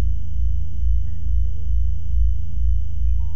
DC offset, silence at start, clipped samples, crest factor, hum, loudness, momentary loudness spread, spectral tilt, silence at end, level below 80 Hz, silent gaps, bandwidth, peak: 20%; 0 s; under 0.1%; 10 dB; none; -25 LUFS; 3 LU; -9 dB/octave; 0 s; -22 dBFS; none; 3.2 kHz; -8 dBFS